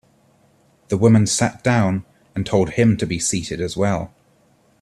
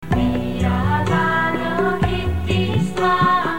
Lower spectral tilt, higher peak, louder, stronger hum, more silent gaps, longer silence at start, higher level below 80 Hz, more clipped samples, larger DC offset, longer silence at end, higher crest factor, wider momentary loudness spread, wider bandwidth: second, -5.5 dB/octave vs -7 dB/octave; about the same, -2 dBFS vs -4 dBFS; about the same, -19 LUFS vs -19 LUFS; neither; neither; first, 0.9 s vs 0 s; second, -48 dBFS vs -32 dBFS; neither; second, under 0.1% vs 2%; first, 0.75 s vs 0 s; about the same, 18 dB vs 14 dB; first, 12 LU vs 4 LU; second, 13 kHz vs 17 kHz